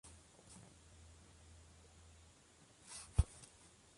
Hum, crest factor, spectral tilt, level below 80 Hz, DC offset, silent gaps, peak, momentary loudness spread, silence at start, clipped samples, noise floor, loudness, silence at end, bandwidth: none; 28 dB; -5 dB/octave; -48 dBFS; under 0.1%; none; -18 dBFS; 24 LU; 0.05 s; under 0.1%; -67 dBFS; -43 LUFS; 0.5 s; 11.5 kHz